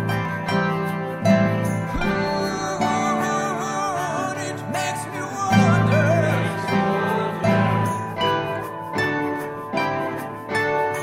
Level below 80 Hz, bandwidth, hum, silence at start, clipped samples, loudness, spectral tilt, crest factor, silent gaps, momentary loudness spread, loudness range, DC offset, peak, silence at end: -46 dBFS; 16 kHz; none; 0 s; under 0.1%; -22 LUFS; -6 dB/octave; 16 dB; none; 9 LU; 4 LU; under 0.1%; -4 dBFS; 0 s